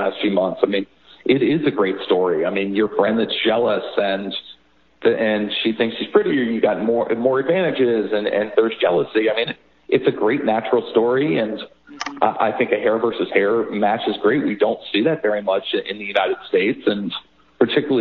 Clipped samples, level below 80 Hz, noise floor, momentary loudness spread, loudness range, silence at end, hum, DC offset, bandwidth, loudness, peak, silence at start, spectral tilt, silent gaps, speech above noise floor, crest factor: under 0.1%; -62 dBFS; -55 dBFS; 6 LU; 2 LU; 0 s; none; 0.1%; 6.8 kHz; -19 LUFS; 0 dBFS; 0 s; -3.5 dB/octave; none; 36 dB; 18 dB